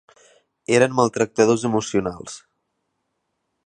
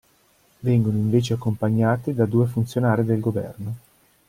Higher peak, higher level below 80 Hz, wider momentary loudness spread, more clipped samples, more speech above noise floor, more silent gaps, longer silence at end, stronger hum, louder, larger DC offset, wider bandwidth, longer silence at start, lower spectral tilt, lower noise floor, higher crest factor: first, -2 dBFS vs -6 dBFS; about the same, -56 dBFS vs -54 dBFS; first, 19 LU vs 10 LU; neither; first, 56 dB vs 39 dB; neither; first, 1.3 s vs 0.5 s; neither; about the same, -20 LUFS vs -22 LUFS; neither; second, 10.5 kHz vs 15 kHz; about the same, 0.7 s vs 0.65 s; second, -5 dB/octave vs -8 dB/octave; first, -75 dBFS vs -60 dBFS; about the same, 20 dB vs 16 dB